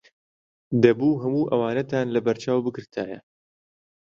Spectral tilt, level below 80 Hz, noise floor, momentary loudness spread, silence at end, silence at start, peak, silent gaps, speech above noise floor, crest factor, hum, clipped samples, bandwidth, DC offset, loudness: -7.5 dB/octave; -64 dBFS; under -90 dBFS; 13 LU; 0.95 s; 0.7 s; -2 dBFS; none; over 67 dB; 22 dB; none; under 0.1%; 7.6 kHz; under 0.1%; -23 LUFS